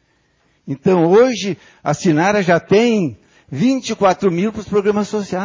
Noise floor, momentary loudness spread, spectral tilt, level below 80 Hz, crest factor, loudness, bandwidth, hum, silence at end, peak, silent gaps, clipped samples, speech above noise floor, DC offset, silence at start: -60 dBFS; 11 LU; -6 dB/octave; -52 dBFS; 14 dB; -16 LUFS; 7.6 kHz; none; 0 s; -2 dBFS; none; under 0.1%; 45 dB; under 0.1%; 0.65 s